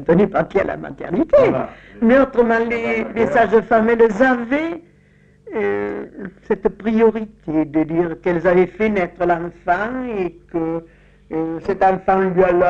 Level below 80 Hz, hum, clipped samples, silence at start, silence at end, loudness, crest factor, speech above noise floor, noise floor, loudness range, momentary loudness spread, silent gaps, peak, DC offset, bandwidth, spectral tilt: -44 dBFS; none; under 0.1%; 0 s; 0 s; -18 LUFS; 14 dB; 34 dB; -52 dBFS; 5 LU; 12 LU; none; -2 dBFS; under 0.1%; 7.8 kHz; -8 dB/octave